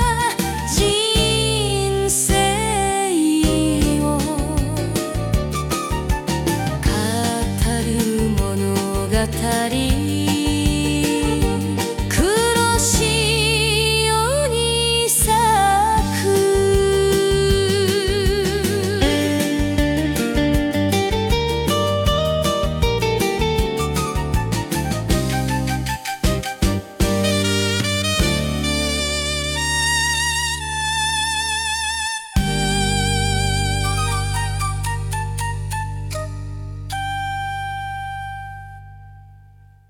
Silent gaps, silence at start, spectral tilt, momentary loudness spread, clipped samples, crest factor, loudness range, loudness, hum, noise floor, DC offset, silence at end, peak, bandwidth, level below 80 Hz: none; 0 s; -4 dB/octave; 8 LU; under 0.1%; 16 dB; 6 LU; -19 LUFS; none; -47 dBFS; under 0.1%; 0.5 s; -4 dBFS; 18 kHz; -28 dBFS